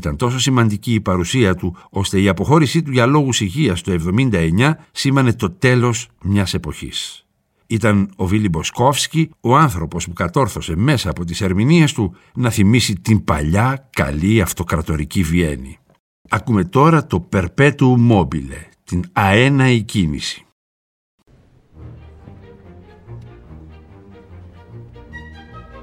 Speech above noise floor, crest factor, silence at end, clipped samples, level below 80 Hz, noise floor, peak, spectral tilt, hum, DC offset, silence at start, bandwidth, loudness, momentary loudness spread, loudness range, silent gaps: 34 dB; 16 dB; 0 s; under 0.1%; -36 dBFS; -50 dBFS; 0 dBFS; -5.5 dB/octave; none; under 0.1%; 0 s; 17 kHz; -16 LUFS; 11 LU; 3 LU; 15.99-16.25 s, 20.52-21.18 s